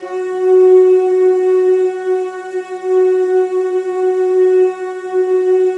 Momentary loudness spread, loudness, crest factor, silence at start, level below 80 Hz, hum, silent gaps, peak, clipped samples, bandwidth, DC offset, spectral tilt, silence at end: 12 LU; -13 LUFS; 12 dB; 0 s; -78 dBFS; none; none; -2 dBFS; under 0.1%; 7.8 kHz; under 0.1%; -5 dB/octave; 0 s